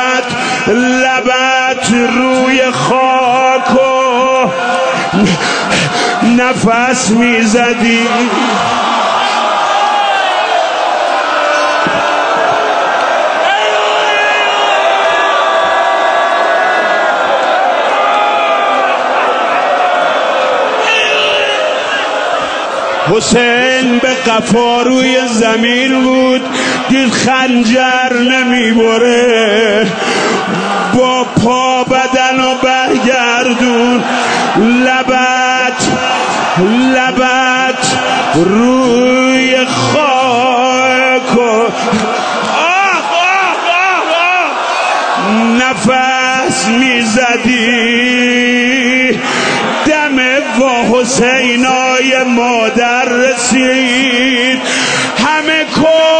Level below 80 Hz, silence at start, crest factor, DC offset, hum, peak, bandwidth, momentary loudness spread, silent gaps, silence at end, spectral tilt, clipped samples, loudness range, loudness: -46 dBFS; 0 s; 10 dB; under 0.1%; none; 0 dBFS; 9.4 kHz; 3 LU; none; 0 s; -3.5 dB/octave; under 0.1%; 1 LU; -10 LUFS